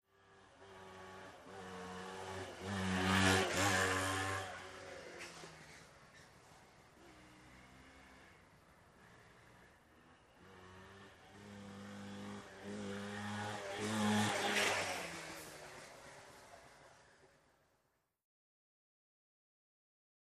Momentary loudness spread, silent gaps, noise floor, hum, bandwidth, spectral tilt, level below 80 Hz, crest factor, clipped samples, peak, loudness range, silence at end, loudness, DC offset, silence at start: 26 LU; none; -82 dBFS; none; 15 kHz; -3.5 dB/octave; -74 dBFS; 24 dB; under 0.1%; -20 dBFS; 25 LU; 2.95 s; -39 LUFS; under 0.1%; 0.3 s